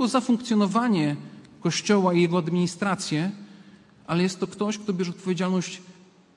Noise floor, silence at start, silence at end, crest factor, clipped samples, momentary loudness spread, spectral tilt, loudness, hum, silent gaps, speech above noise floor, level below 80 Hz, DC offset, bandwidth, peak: -51 dBFS; 0 s; 0.45 s; 16 dB; under 0.1%; 10 LU; -5.5 dB/octave; -25 LUFS; none; none; 27 dB; -70 dBFS; under 0.1%; 11.5 kHz; -8 dBFS